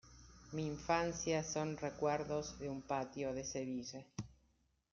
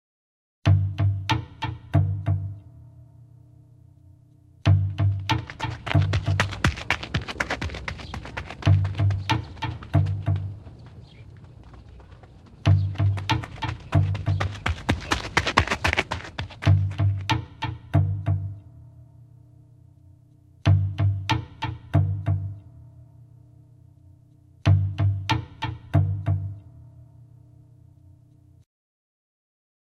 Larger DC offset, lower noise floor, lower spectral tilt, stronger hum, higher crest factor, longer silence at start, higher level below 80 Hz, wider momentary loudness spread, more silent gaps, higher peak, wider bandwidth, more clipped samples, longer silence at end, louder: neither; first, -77 dBFS vs -54 dBFS; second, -4.5 dB/octave vs -6 dB/octave; neither; second, 20 dB vs 26 dB; second, 0.05 s vs 0.65 s; second, -64 dBFS vs -44 dBFS; about the same, 14 LU vs 13 LU; neither; second, -22 dBFS vs 0 dBFS; second, 7.4 kHz vs 9.4 kHz; neither; second, 0.6 s vs 2.8 s; second, -41 LUFS vs -25 LUFS